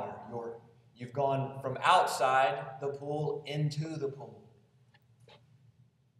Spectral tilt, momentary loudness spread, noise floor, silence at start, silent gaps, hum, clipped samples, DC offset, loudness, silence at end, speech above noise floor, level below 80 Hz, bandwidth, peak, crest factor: -5 dB/octave; 19 LU; -65 dBFS; 0 s; none; none; under 0.1%; under 0.1%; -32 LUFS; 0.85 s; 34 dB; -78 dBFS; 14.5 kHz; -10 dBFS; 22 dB